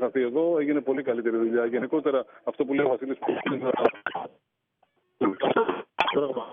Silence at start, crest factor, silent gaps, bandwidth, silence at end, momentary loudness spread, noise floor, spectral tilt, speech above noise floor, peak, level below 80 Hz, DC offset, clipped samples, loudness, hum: 0 s; 20 dB; none; 6.2 kHz; 0 s; 6 LU; -71 dBFS; -3.5 dB/octave; 45 dB; -6 dBFS; -72 dBFS; under 0.1%; under 0.1%; -26 LUFS; none